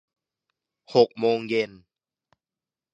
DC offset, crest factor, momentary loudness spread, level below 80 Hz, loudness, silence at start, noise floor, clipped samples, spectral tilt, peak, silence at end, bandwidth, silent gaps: under 0.1%; 24 dB; 6 LU; -70 dBFS; -24 LUFS; 0.9 s; under -90 dBFS; under 0.1%; -6 dB/octave; -4 dBFS; 1.25 s; 7.6 kHz; none